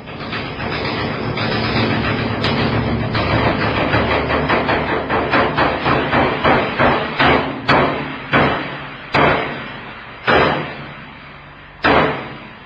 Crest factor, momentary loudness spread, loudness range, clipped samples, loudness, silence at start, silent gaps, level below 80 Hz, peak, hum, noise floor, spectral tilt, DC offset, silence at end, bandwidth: 18 dB; 13 LU; 4 LU; under 0.1%; -17 LUFS; 0 s; none; -34 dBFS; 0 dBFS; none; -38 dBFS; -7.5 dB/octave; under 0.1%; 0 s; 8 kHz